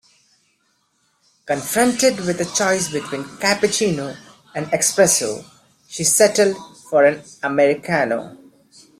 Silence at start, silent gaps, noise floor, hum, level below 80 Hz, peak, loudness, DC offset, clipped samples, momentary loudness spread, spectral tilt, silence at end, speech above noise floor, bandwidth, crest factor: 1.45 s; none; -65 dBFS; none; -60 dBFS; -2 dBFS; -18 LUFS; under 0.1%; under 0.1%; 15 LU; -3 dB/octave; 0.65 s; 47 dB; 16 kHz; 18 dB